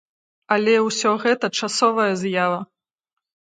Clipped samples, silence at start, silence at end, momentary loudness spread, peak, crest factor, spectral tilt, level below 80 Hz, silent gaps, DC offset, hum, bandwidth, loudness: under 0.1%; 0.5 s; 0.85 s; 5 LU; -4 dBFS; 18 dB; -3.5 dB/octave; -74 dBFS; none; under 0.1%; none; 9.6 kHz; -20 LUFS